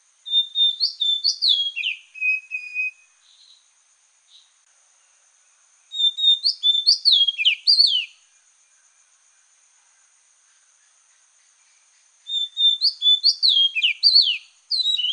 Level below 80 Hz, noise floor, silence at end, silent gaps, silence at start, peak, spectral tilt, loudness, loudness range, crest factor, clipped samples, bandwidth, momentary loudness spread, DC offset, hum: under -90 dBFS; -60 dBFS; 0 s; none; 0.25 s; -4 dBFS; 11 dB/octave; -17 LUFS; 12 LU; 18 dB; under 0.1%; 10.5 kHz; 12 LU; under 0.1%; none